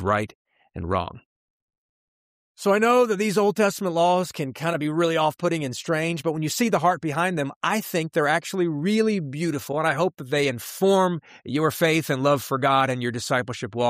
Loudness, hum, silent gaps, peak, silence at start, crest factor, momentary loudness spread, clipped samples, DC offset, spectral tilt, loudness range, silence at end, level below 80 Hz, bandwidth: -23 LUFS; none; 0.35-0.45 s, 1.25-1.68 s, 1.77-2.55 s, 7.56-7.61 s; -8 dBFS; 0 s; 16 dB; 7 LU; under 0.1%; under 0.1%; -5 dB/octave; 2 LU; 0 s; -58 dBFS; 15.5 kHz